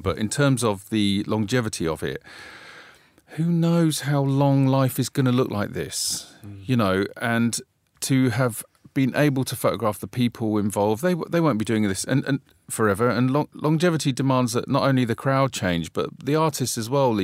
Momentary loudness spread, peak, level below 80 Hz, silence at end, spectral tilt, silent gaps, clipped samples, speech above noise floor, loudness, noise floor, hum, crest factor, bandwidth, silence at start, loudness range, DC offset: 9 LU; -6 dBFS; -56 dBFS; 0 s; -5.5 dB/octave; none; under 0.1%; 28 dB; -23 LUFS; -51 dBFS; none; 16 dB; 16 kHz; 0 s; 3 LU; under 0.1%